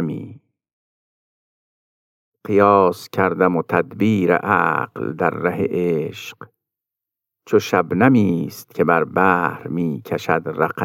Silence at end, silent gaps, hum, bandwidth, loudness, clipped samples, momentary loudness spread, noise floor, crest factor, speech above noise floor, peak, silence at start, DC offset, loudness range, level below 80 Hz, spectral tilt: 0 s; 0.73-2.32 s; none; 17 kHz; -18 LUFS; under 0.1%; 12 LU; -86 dBFS; 18 dB; 68 dB; -2 dBFS; 0 s; under 0.1%; 4 LU; -64 dBFS; -7 dB/octave